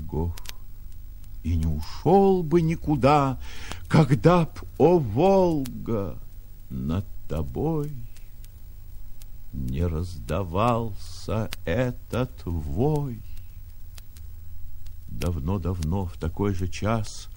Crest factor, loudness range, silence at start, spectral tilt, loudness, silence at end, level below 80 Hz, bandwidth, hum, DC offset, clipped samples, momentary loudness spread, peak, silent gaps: 22 dB; 11 LU; 0 s; -7.5 dB/octave; -25 LUFS; 0 s; -38 dBFS; 17 kHz; none; under 0.1%; under 0.1%; 25 LU; -4 dBFS; none